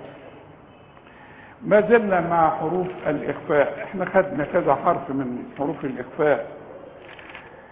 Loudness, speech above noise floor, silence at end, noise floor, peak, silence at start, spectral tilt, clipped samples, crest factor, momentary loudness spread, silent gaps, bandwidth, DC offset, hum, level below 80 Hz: -22 LUFS; 26 dB; 0.05 s; -48 dBFS; -4 dBFS; 0 s; -10.5 dB/octave; under 0.1%; 20 dB; 22 LU; none; 3.9 kHz; under 0.1%; none; -56 dBFS